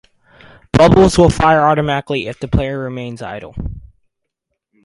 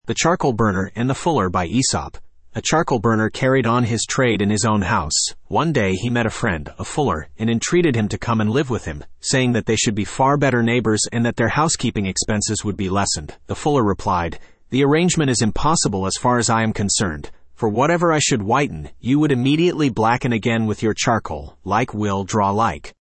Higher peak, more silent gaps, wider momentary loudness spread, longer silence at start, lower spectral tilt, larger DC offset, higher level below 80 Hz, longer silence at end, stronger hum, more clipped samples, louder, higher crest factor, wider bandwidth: first, 0 dBFS vs -4 dBFS; neither; first, 19 LU vs 7 LU; first, 0.75 s vs 0.05 s; first, -6.5 dB/octave vs -4.5 dB/octave; neither; first, -30 dBFS vs -42 dBFS; first, 1 s vs 0.3 s; neither; neither; first, -13 LUFS vs -19 LUFS; about the same, 16 dB vs 14 dB; first, 11.5 kHz vs 8.8 kHz